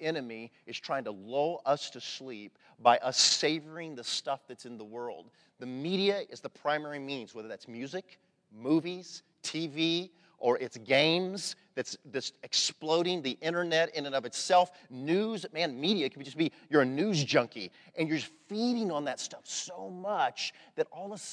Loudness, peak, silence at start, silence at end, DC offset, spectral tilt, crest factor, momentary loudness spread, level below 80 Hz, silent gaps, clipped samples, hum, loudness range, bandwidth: -31 LUFS; -10 dBFS; 0 s; 0 s; under 0.1%; -3.5 dB/octave; 22 dB; 16 LU; -88 dBFS; none; under 0.1%; none; 6 LU; 11 kHz